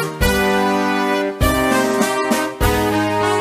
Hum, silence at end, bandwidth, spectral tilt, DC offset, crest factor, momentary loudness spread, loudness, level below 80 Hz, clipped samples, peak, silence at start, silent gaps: none; 0 s; 15.5 kHz; -4.5 dB/octave; under 0.1%; 14 dB; 2 LU; -17 LUFS; -28 dBFS; under 0.1%; -2 dBFS; 0 s; none